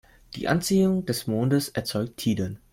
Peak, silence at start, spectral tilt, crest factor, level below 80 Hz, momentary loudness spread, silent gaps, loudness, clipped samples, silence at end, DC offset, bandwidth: -6 dBFS; 0.3 s; -5.5 dB/octave; 20 dB; -54 dBFS; 8 LU; none; -25 LUFS; under 0.1%; 0.15 s; under 0.1%; 16.5 kHz